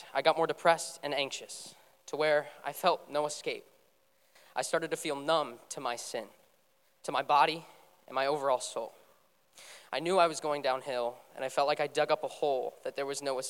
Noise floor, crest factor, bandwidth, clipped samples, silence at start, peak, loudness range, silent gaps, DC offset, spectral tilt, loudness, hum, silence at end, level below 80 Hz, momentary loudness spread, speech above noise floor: -71 dBFS; 22 dB; 17 kHz; under 0.1%; 0 s; -12 dBFS; 4 LU; none; under 0.1%; -2.5 dB/octave; -32 LUFS; none; 0 s; -88 dBFS; 13 LU; 39 dB